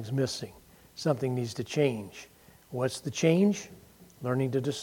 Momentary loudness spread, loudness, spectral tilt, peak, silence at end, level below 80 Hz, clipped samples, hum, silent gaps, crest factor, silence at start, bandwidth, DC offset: 19 LU; -30 LUFS; -6 dB/octave; -10 dBFS; 0 s; -66 dBFS; under 0.1%; none; none; 20 dB; 0 s; 17.5 kHz; under 0.1%